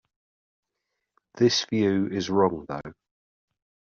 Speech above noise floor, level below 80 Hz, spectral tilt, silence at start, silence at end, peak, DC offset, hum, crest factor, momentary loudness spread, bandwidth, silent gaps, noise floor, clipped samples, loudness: 58 dB; -64 dBFS; -4.5 dB/octave; 1.35 s; 1.05 s; -8 dBFS; under 0.1%; none; 20 dB; 14 LU; 7.4 kHz; none; -82 dBFS; under 0.1%; -24 LUFS